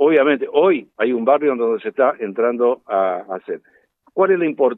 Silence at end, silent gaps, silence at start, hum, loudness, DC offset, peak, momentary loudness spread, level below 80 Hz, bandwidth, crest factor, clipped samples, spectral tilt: 0 s; none; 0 s; none; -18 LUFS; under 0.1%; -2 dBFS; 12 LU; -78 dBFS; 4 kHz; 14 dB; under 0.1%; -9 dB/octave